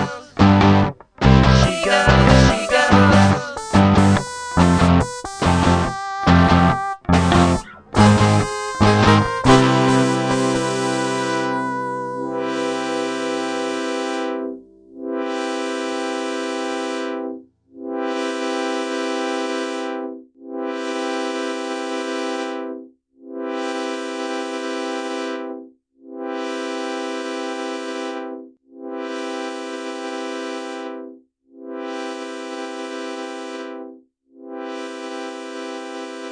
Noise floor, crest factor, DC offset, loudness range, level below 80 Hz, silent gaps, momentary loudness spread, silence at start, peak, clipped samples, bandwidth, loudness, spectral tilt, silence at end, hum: -47 dBFS; 20 dB; under 0.1%; 15 LU; -34 dBFS; none; 18 LU; 0 s; 0 dBFS; under 0.1%; 10.5 kHz; -19 LUFS; -6 dB/octave; 0 s; none